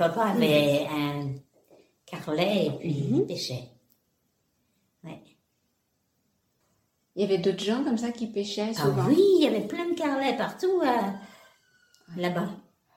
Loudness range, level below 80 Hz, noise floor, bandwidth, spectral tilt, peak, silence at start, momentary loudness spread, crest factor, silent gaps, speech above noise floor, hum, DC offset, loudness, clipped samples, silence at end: 9 LU; -68 dBFS; -75 dBFS; 16.5 kHz; -6 dB/octave; -8 dBFS; 0 s; 18 LU; 20 dB; none; 49 dB; none; under 0.1%; -26 LUFS; under 0.1%; 0.35 s